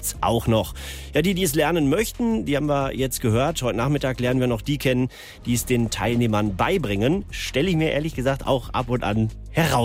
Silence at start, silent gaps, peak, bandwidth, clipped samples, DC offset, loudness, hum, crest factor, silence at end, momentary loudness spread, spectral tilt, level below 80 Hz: 0 s; none; -8 dBFS; 16 kHz; under 0.1%; under 0.1%; -23 LUFS; none; 14 dB; 0 s; 5 LU; -5.5 dB/octave; -38 dBFS